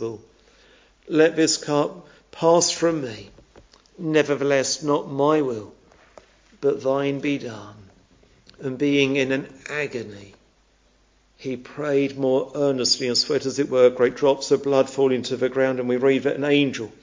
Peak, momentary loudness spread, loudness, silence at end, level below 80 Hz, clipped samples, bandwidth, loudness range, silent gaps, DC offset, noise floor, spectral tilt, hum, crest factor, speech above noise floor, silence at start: -4 dBFS; 15 LU; -22 LUFS; 0.15 s; -62 dBFS; under 0.1%; 7.6 kHz; 6 LU; none; under 0.1%; -60 dBFS; -4 dB/octave; none; 18 dB; 39 dB; 0 s